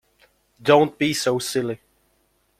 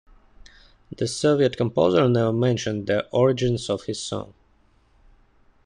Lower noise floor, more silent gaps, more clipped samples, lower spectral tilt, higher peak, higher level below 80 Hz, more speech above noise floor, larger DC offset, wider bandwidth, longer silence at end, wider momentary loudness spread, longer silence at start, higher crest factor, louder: first, -66 dBFS vs -60 dBFS; neither; neither; second, -4.5 dB/octave vs -6 dB/octave; first, -2 dBFS vs -6 dBFS; second, -62 dBFS vs -52 dBFS; first, 46 dB vs 38 dB; neither; first, 16 kHz vs 10.5 kHz; second, 0.85 s vs 1.35 s; about the same, 12 LU vs 11 LU; second, 0.6 s vs 0.9 s; about the same, 22 dB vs 18 dB; about the same, -21 LUFS vs -22 LUFS